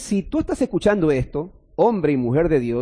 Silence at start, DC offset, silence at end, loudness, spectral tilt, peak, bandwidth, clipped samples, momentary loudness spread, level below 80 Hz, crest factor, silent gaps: 0 s; under 0.1%; 0 s; -20 LUFS; -7 dB/octave; -6 dBFS; 10.5 kHz; under 0.1%; 8 LU; -40 dBFS; 14 dB; none